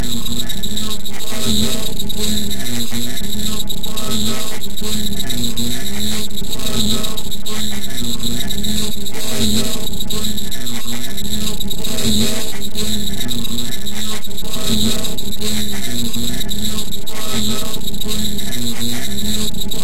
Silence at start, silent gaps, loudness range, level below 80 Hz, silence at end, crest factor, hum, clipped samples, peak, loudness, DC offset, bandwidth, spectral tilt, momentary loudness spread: 0 s; none; 1 LU; -30 dBFS; 0 s; 16 dB; none; under 0.1%; 0 dBFS; -21 LUFS; 30%; 17 kHz; -3 dB/octave; 6 LU